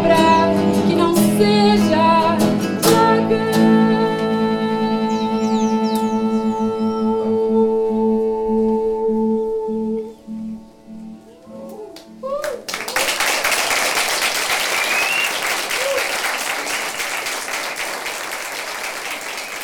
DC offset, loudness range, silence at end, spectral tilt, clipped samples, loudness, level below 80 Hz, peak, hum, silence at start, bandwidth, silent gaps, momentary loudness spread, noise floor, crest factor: under 0.1%; 9 LU; 0 s; -4 dB/octave; under 0.1%; -18 LUFS; -52 dBFS; -2 dBFS; none; 0 s; 20 kHz; none; 12 LU; -38 dBFS; 16 dB